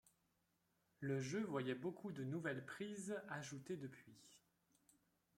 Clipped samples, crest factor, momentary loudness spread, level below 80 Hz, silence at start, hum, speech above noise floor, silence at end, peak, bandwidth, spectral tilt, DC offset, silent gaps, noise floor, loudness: under 0.1%; 18 dB; 16 LU; -86 dBFS; 1 s; none; 37 dB; 1 s; -30 dBFS; 16 kHz; -5.5 dB/octave; under 0.1%; none; -84 dBFS; -47 LUFS